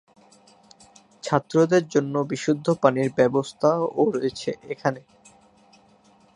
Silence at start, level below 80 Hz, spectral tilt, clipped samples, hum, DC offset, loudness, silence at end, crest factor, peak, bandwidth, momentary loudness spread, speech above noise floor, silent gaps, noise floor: 1.25 s; -66 dBFS; -6 dB/octave; under 0.1%; none; under 0.1%; -23 LUFS; 1.35 s; 22 dB; -2 dBFS; 10.5 kHz; 8 LU; 35 dB; none; -57 dBFS